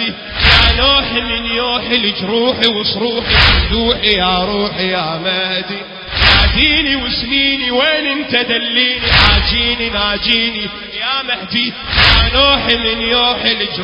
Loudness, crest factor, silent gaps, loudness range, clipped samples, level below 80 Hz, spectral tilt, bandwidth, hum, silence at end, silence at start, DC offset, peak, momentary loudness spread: -12 LUFS; 14 dB; none; 1 LU; under 0.1%; -24 dBFS; -5.5 dB/octave; 8 kHz; none; 0 s; 0 s; under 0.1%; 0 dBFS; 8 LU